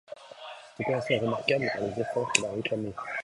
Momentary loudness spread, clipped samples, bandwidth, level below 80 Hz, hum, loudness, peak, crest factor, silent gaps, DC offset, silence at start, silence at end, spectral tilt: 17 LU; under 0.1%; 11.5 kHz; -64 dBFS; none; -29 LUFS; -2 dBFS; 30 dB; none; under 0.1%; 0.1 s; 0 s; -3.5 dB/octave